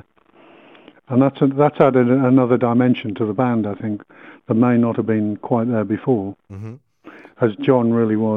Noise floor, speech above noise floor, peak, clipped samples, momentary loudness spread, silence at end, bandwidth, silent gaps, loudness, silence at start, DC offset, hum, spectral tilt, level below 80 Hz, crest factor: -51 dBFS; 34 dB; 0 dBFS; under 0.1%; 12 LU; 0 s; 3.9 kHz; none; -18 LUFS; 1.1 s; under 0.1%; none; -10.5 dB/octave; -64 dBFS; 18 dB